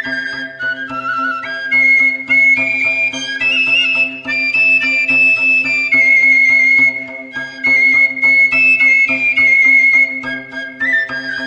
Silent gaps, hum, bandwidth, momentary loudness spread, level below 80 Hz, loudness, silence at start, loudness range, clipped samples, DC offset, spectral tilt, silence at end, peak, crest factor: none; none; 9.6 kHz; 13 LU; -58 dBFS; -10 LUFS; 0 s; 3 LU; under 0.1%; under 0.1%; -2 dB/octave; 0 s; -2 dBFS; 12 dB